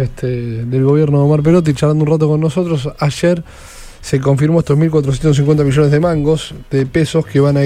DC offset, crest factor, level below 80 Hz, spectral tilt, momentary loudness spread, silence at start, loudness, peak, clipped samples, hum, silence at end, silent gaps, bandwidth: under 0.1%; 12 dB; -36 dBFS; -7.5 dB/octave; 8 LU; 0 s; -14 LUFS; 0 dBFS; under 0.1%; none; 0 s; none; 11 kHz